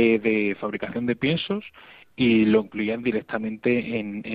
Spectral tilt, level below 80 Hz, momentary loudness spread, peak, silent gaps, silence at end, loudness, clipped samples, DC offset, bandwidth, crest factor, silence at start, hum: -9 dB/octave; -60 dBFS; 10 LU; -8 dBFS; none; 0 s; -24 LUFS; under 0.1%; under 0.1%; 5 kHz; 16 dB; 0 s; none